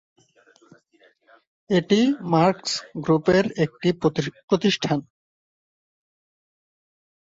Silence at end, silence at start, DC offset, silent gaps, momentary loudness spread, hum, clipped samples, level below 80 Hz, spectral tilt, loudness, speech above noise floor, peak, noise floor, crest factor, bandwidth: 2.25 s; 1.7 s; under 0.1%; 4.43-4.48 s; 8 LU; none; under 0.1%; -58 dBFS; -5.5 dB/octave; -22 LUFS; 38 dB; -4 dBFS; -60 dBFS; 20 dB; 8 kHz